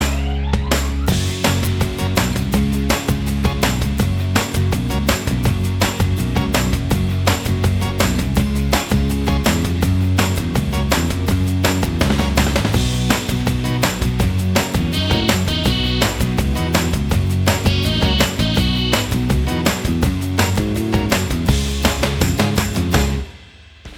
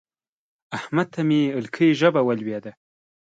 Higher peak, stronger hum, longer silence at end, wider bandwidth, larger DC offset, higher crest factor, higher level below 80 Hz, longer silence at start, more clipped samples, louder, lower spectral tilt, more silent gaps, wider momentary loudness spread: first, 0 dBFS vs -4 dBFS; neither; second, 0 s vs 0.5 s; first, 19.5 kHz vs 7.8 kHz; neither; about the same, 18 dB vs 18 dB; first, -26 dBFS vs -70 dBFS; second, 0 s vs 0.7 s; neither; first, -18 LUFS vs -21 LUFS; second, -5 dB/octave vs -7 dB/octave; neither; second, 3 LU vs 16 LU